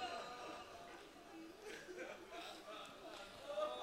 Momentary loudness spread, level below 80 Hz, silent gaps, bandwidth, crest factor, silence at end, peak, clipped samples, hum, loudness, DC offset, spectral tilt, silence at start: 10 LU; -76 dBFS; none; 16 kHz; 20 dB; 0 s; -30 dBFS; under 0.1%; none; -52 LUFS; under 0.1%; -2.5 dB/octave; 0 s